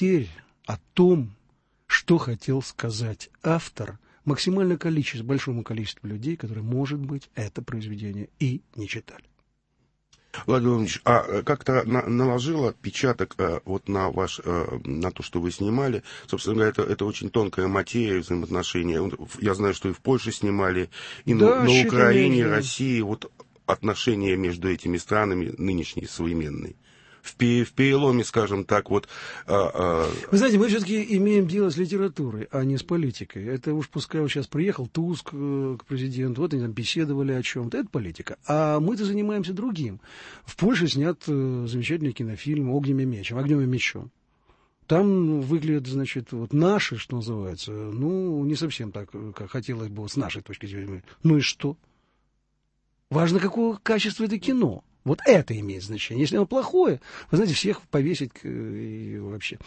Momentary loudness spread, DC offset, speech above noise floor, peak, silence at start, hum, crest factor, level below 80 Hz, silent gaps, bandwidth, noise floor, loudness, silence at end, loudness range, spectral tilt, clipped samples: 13 LU; under 0.1%; 48 dB; -4 dBFS; 0 s; none; 22 dB; -52 dBFS; none; 8.8 kHz; -72 dBFS; -25 LUFS; 0.1 s; 6 LU; -6 dB/octave; under 0.1%